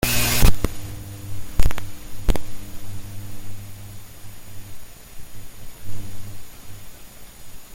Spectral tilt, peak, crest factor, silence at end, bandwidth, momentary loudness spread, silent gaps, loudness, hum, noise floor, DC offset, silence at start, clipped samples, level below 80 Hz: -3.5 dB/octave; -2 dBFS; 18 dB; 0 s; 17 kHz; 23 LU; none; -27 LUFS; none; -39 dBFS; under 0.1%; 0 s; under 0.1%; -28 dBFS